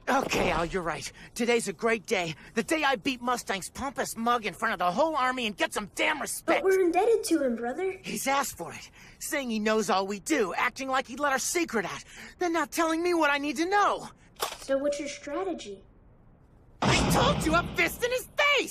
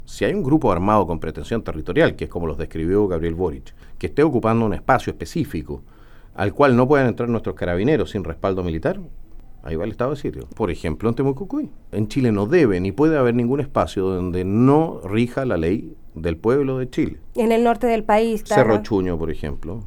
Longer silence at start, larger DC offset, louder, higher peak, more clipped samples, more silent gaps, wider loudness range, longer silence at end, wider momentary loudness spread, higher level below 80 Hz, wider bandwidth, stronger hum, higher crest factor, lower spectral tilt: about the same, 0.05 s vs 0.05 s; neither; second, -28 LUFS vs -20 LUFS; second, -10 dBFS vs 0 dBFS; neither; neither; about the same, 3 LU vs 5 LU; about the same, 0 s vs 0 s; about the same, 11 LU vs 11 LU; second, -50 dBFS vs -36 dBFS; second, 15.5 kHz vs 19 kHz; neither; about the same, 18 dB vs 20 dB; second, -3.5 dB/octave vs -7.5 dB/octave